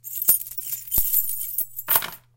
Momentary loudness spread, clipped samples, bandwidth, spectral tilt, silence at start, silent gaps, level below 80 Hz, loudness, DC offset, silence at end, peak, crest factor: 8 LU; under 0.1%; 17.5 kHz; 0 dB/octave; 0.05 s; none; -46 dBFS; -21 LUFS; under 0.1%; 0.2 s; -2 dBFS; 24 dB